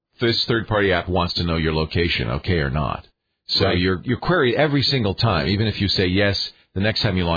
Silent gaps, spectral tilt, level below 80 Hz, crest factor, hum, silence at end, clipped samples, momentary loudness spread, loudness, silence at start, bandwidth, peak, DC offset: none; -6.5 dB/octave; -38 dBFS; 16 dB; none; 0 s; under 0.1%; 5 LU; -20 LUFS; 0.2 s; 5 kHz; -4 dBFS; under 0.1%